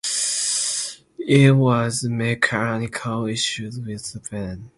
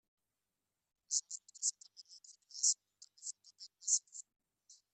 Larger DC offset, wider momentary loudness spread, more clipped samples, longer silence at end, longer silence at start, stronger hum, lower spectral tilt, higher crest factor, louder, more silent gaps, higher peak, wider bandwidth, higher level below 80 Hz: neither; second, 16 LU vs 23 LU; neither; about the same, 0.1 s vs 0.2 s; second, 0.05 s vs 1.1 s; neither; first, -4 dB/octave vs 7 dB/octave; second, 20 dB vs 26 dB; first, -21 LUFS vs -37 LUFS; neither; first, -2 dBFS vs -18 dBFS; about the same, 11.5 kHz vs 12 kHz; first, -52 dBFS vs under -90 dBFS